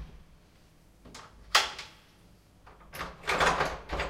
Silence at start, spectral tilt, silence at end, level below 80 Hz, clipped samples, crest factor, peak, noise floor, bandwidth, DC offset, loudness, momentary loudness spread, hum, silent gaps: 0 s; -2 dB/octave; 0 s; -48 dBFS; under 0.1%; 26 dB; -8 dBFS; -59 dBFS; 16 kHz; under 0.1%; -29 LUFS; 23 LU; none; none